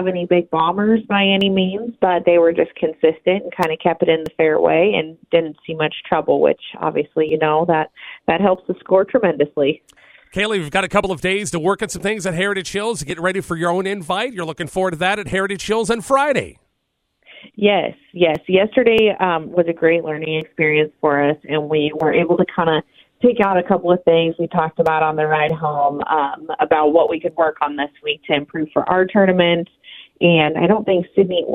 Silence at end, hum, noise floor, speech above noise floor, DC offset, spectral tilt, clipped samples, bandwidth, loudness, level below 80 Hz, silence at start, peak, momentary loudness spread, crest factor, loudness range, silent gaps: 0 s; none; -71 dBFS; 54 dB; under 0.1%; -5.5 dB/octave; under 0.1%; 14.5 kHz; -17 LUFS; -52 dBFS; 0 s; 0 dBFS; 8 LU; 18 dB; 4 LU; none